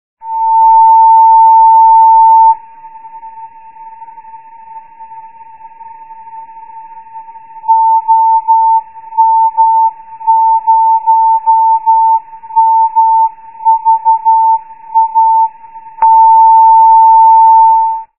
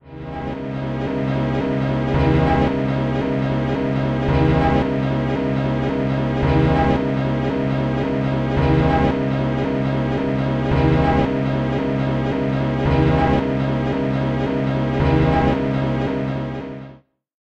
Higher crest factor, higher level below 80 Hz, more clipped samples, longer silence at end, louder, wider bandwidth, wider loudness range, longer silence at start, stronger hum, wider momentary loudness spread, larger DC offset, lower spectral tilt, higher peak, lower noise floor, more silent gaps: second, 8 dB vs 14 dB; second, -68 dBFS vs -32 dBFS; neither; second, 0.15 s vs 0.55 s; first, -7 LUFS vs -20 LUFS; second, 2.7 kHz vs 6.8 kHz; first, 7 LU vs 1 LU; first, 0.25 s vs 0.05 s; neither; first, 10 LU vs 6 LU; first, 0.8% vs under 0.1%; second, -6.5 dB/octave vs -9 dB/octave; first, 0 dBFS vs -4 dBFS; second, -34 dBFS vs -46 dBFS; neither